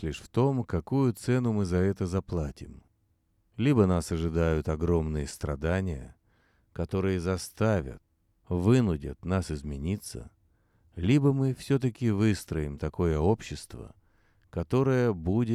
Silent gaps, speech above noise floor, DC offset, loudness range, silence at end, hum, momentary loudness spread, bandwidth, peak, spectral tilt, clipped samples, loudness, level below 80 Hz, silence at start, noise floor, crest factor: none; 43 dB; under 0.1%; 3 LU; 0 s; none; 15 LU; 14 kHz; -10 dBFS; -7.5 dB/octave; under 0.1%; -28 LUFS; -44 dBFS; 0 s; -71 dBFS; 20 dB